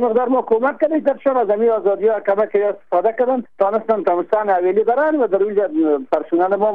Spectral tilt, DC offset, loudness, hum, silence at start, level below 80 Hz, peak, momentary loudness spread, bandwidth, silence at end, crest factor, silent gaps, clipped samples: -8.5 dB/octave; 0.5%; -17 LUFS; none; 0 s; -62 dBFS; -4 dBFS; 3 LU; 4.8 kHz; 0 s; 12 dB; none; under 0.1%